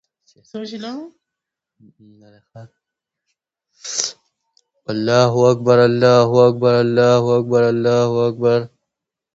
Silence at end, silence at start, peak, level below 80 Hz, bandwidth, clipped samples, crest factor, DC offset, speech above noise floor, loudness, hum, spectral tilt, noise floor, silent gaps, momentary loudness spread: 0.7 s; 0.55 s; 0 dBFS; -60 dBFS; 8 kHz; under 0.1%; 18 dB; under 0.1%; 68 dB; -15 LUFS; none; -5.5 dB/octave; -83 dBFS; none; 19 LU